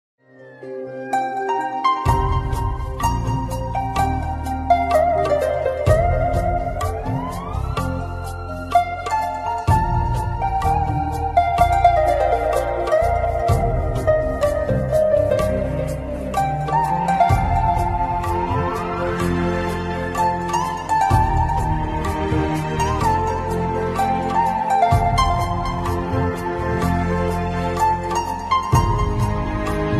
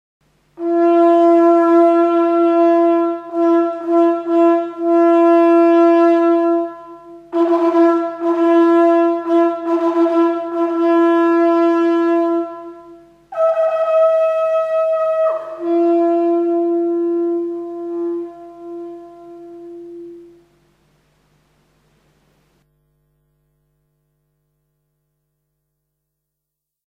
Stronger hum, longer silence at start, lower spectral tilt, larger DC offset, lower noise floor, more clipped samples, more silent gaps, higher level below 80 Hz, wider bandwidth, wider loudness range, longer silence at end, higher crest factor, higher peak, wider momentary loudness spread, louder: neither; second, 0.4 s vs 0.6 s; about the same, -6.5 dB/octave vs -6 dB/octave; neither; second, -40 dBFS vs -81 dBFS; neither; neither; first, -28 dBFS vs -68 dBFS; first, 14.5 kHz vs 5 kHz; second, 4 LU vs 10 LU; second, 0 s vs 6.65 s; about the same, 18 dB vs 14 dB; about the same, -2 dBFS vs -2 dBFS; second, 7 LU vs 17 LU; second, -20 LUFS vs -15 LUFS